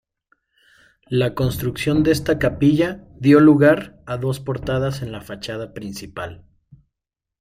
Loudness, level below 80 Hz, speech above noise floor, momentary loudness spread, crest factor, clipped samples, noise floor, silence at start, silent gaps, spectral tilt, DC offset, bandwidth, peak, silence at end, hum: -19 LUFS; -44 dBFS; 67 dB; 18 LU; 18 dB; under 0.1%; -85 dBFS; 1.1 s; none; -7 dB/octave; under 0.1%; 15.5 kHz; -2 dBFS; 1.05 s; none